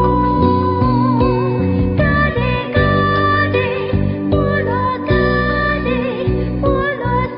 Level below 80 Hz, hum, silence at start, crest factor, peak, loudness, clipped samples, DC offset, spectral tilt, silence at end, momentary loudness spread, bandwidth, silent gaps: -26 dBFS; none; 0 s; 14 dB; -2 dBFS; -16 LUFS; under 0.1%; under 0.1%; -11.5 dB/octave; 0 s; 4 LU; 5.4 kHz; none